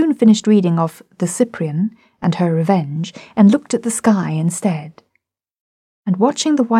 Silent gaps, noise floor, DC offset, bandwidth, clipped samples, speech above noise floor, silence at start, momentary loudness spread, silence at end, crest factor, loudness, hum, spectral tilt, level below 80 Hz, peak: 5.60-6.03 s; -69 dBFS; under 0.1%; 13.5 kHz; under 0.1%; 54 dB; 0 s; 11 LU; 0 s; 14 dB; -17 LUFS; none; -6 dB/octave; -62 dBFS; -2 dBFS